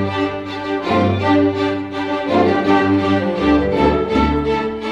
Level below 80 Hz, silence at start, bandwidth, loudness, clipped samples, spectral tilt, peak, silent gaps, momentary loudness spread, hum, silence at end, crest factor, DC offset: -34 dBFS; 0 s; 8 kHz; -17 LUFS; under 0.1%; -7.5 dB/octave; -2 dBFS; none; 7 LU; none; 0 s; 14 dB; under 0.1%